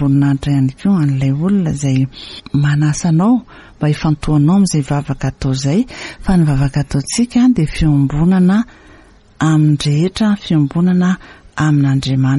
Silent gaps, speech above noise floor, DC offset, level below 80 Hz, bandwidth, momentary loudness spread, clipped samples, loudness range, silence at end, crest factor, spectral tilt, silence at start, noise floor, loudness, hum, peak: none; 30 dB; under 0.1%; -32 dBFS; 11.5 kHz; 7 LU; under 0.1%; 1 LU; 0 s; 10 dB; -6.5 dB/octave; 0 s; -43 dBFS; -14 LUFS; none; -2 dBFS